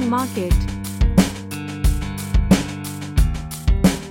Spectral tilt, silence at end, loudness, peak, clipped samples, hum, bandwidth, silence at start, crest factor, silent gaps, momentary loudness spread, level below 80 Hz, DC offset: -6 dB/octave; 0 s; -21 LUFS; -4 dBFS; under 0.1%; none; 17 kHz; 0 s; 16 dB; none; 10 LU; -22 dBFS; under 0.1%